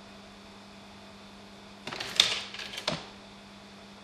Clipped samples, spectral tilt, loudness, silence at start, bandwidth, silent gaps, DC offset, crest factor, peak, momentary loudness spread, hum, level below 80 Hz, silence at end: under 0.1%; -1 dB/octave; -29 LUFS; 0 s; 15.5 kHz; none; under 0.1%; 36 dB; 0 dBFS; 24 LU; none; -64 dBFS; 0 s